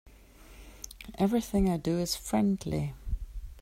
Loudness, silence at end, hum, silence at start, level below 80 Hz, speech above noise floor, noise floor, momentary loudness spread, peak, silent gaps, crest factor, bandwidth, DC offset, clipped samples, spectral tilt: -30 LUFS; 0 s; none; 0.05 s; -42 dBFS; 24 dB; -53 dBFS; 17 LU; -16 dBFS; none; 14 dB; 16 kHz; under 0.1%; under 0.1%; -6 dB/octave